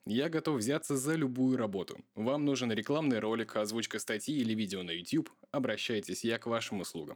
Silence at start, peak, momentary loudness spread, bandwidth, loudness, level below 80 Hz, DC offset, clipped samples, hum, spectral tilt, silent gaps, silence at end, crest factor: 0.05 s; -18 dBFS; 6 LU; 19.5 kHz; -34 LUFS; -80 dBFS; under 0.1%; under 0.1%; none; -4.5 dB/octave; none; 0 s; 16 dB